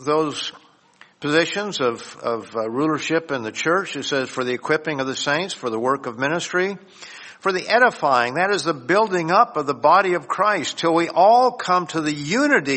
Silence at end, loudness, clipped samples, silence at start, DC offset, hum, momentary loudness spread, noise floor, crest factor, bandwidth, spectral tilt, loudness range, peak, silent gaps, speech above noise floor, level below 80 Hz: 0 s; -20 LUFS; under 0.1%; 0 s; under 0.1%; none; 10 LU; -52 dBFS; 18 dB; 8.8 kHz; -4 dB/octave; 5 LU; -2 dBFS; none; 32 dB; -68 dBFS